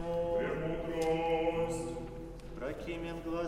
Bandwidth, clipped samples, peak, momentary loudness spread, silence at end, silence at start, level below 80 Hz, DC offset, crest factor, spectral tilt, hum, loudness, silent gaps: 14 kHz; under 0.1%; -20 dBFS; 11 LU; 0 s; 0 s; -50 dBFS; under 0.1%; 16 dB; -6 dB/octave; none; -35 LUFS; none